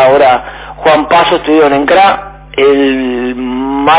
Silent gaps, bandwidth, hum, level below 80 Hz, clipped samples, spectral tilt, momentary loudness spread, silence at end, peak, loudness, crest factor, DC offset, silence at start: none; 4 kHz; none; -36 dBFS; 0.5%; -8.5 dB/octave; 9 LU; 0 s; 0 dBFS; -9 LUFS; 8 dB; under 0.1%; 0 s